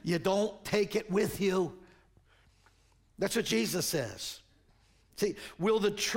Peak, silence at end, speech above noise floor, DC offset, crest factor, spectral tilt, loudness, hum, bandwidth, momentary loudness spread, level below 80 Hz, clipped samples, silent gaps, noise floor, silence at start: -16 dBFS; 0 s; 35 dB; under 0.1%; 18 dB; -4 dB/octave; -32 LUFS; none; 16.5 kHz; 9 LU; -62 dBFS; under 0.1%; none; -66 dBFS; 0.05 s